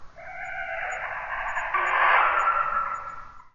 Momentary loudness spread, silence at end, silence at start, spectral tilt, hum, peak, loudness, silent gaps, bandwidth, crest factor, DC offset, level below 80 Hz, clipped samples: 17 LU; 0.05 s; 0 s; -2 dB/octave; none; -8 dBFS; -25 LUFS; none; 7.4 kHz; 18 dB; under 0.1%; -52 dBFS; under 0.1%